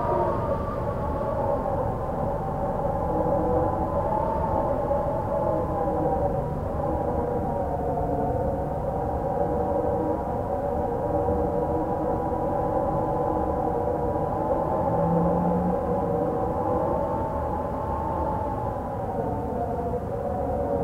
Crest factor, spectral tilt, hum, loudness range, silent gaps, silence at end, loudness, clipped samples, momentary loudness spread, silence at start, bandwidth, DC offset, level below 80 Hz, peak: 16 dB; -10 dB/octave; none; 2 LU; none; 0 s; -26 LUFS; under 0.1%; 4 LU; 0 s; 16 kHz; under 0.1%; -38 dBFS; -10 dBFS